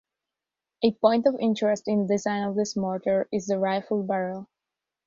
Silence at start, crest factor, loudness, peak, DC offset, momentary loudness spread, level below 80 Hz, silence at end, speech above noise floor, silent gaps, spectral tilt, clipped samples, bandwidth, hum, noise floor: 0.8 s; 20 dB; -25 LUFS; -6 dBFS; under 0.1%; 6 LU; -68 dBFS; 0.6 s; 64 dB; none; -6 dB/octave; under 0.1%; 7.6 kHz; none; -88 dBFS